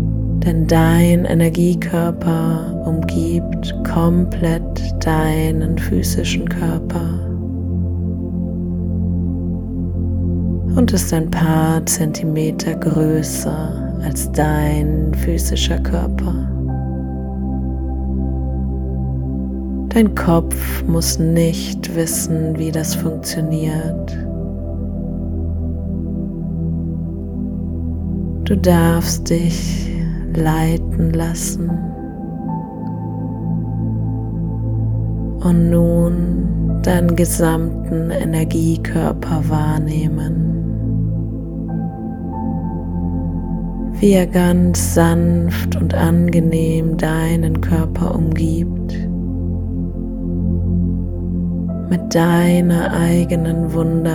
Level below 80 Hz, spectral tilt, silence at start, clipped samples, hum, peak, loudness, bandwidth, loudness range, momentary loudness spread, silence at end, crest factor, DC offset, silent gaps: -26 dBFS; -6.5 dB/octave; 0 s; under 0.1%; none; 0 dBFS; -18 LUFS; 19 kHz; 6 LU; 10 LU; 0 s; 16 dB; under 0.1%; none